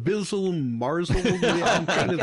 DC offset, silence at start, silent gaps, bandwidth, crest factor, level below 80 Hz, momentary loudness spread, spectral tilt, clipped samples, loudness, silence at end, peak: under 0.1%; 0 s; none; 11.5 kHz; 10 dB; -40 dBFS; 5 LU; -5 dB/octave; under 0.1%; -24 LUFS; 0 s; -12 dBFS